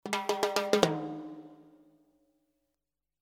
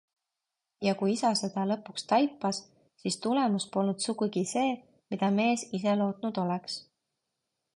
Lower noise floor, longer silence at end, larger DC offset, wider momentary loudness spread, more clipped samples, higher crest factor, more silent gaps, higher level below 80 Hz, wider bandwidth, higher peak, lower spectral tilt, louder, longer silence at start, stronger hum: about the same, -88 dBFS vs -87 dBFS; first, 1.6 s vs 0.95 s; neither; first, 18 LU vs 8 LU; neither; first, 30 dB vs 18 dB; neither; first, -70 dBFS vs -76 dBFS; first, 18.5 kHz vs 11.5 kHz; first, -4 dBFS vs -12 dBFS; about the same, -4 dB/octave vs -5 dB/octave; about the same, -30 LUFS vs -30 LUFS; second, 0.05 s vs 0.8 s; neither